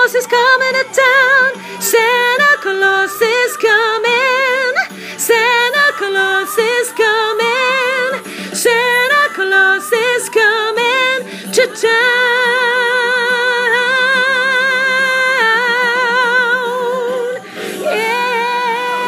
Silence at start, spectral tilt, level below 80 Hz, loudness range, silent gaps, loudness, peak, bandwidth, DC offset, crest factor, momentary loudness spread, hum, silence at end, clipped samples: 0 s; -1 dB/octave; -76 dBFS; 2 LU; none; -12 LUFS; 0 dBFS; 15.5 kHz; under 0.1%; 14 dB; 7 LU; none; 0 s; under 0.1%